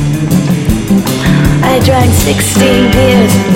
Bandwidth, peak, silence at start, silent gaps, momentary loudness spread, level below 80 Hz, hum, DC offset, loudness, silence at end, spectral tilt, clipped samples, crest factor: 17 kHz; 0 dBFS; 0 s; none; 4 LU; -22 dBFS; none; under 0.1%; -9 LUFS; 0 s; -5.5 dB/octave; 0.4%; 8 dB